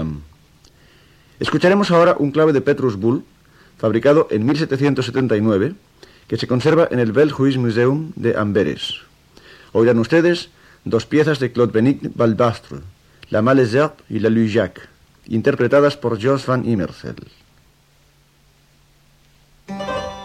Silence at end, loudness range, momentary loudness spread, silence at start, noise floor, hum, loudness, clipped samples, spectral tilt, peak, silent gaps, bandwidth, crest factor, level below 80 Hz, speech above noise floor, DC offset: 0 s; 3 LU; 12 LU; 0 s; -55 dBFS; none; -17 LUFS; under 0.1%; -7 dB/octave; -4 dBFS; none; 13 kHz; 14 dB; -50 dBFS; 38 dB; under 0.1%